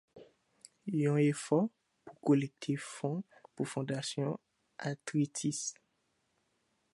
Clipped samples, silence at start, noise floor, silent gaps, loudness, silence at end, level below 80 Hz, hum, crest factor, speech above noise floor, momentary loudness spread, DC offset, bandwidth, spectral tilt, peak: under 0.1%; 0.15 s; -79 dBFS; none; -35 LUFS; 1.2 s; -82 dBFS; none; 20 dB; 45 dB; 12 LU; under 0.1%; 11.5 kHz; -5.5 dB/octave; -16 dBFS